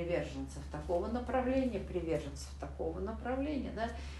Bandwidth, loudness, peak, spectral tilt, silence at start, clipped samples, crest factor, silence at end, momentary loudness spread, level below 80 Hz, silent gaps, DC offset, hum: 12 kHz; -37 LUFS; -22 dBFS; -6.5 dB/octave; 0 s; under 0.1%; 16 dB; 0 s; 10 LU; -46 dBFS; none; under 0.1%; none